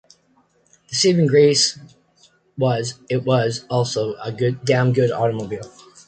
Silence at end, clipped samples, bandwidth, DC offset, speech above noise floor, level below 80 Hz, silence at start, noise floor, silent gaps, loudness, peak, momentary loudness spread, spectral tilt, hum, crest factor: 0.4 s; under 0.1%; 9.2 kHz; under 0.1%; 42 dB; -58 dBFS; 0.9 s; -60 dBFS; none; -19 LUFS; -4 dBFS; 15 LU; -5 dB/octave; none; 16 dB